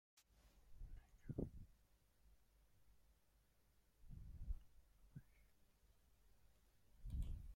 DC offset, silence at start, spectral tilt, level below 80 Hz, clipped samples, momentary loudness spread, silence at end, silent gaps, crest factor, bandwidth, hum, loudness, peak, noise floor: under 0.1%; 0.15 s; -8 dB/octave; -58 dBFS; under 0.1%; 14 LU; 0 s; none; 26 dB; 16.5 kHz; none; -57 LUFS; -32 dBFS; -78 dBFS